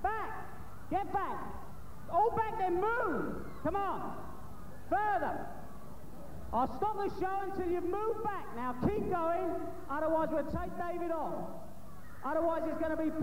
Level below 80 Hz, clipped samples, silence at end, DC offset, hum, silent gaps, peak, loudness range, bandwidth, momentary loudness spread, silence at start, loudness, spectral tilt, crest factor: -54 dBFS; under 0.1%; 0 s; 1%; none; none; -18 dBFS; 3 LU; 16 kHz; 18 LU; 0 s; -35 LUFS; -7.5 dB/octave; 16 dB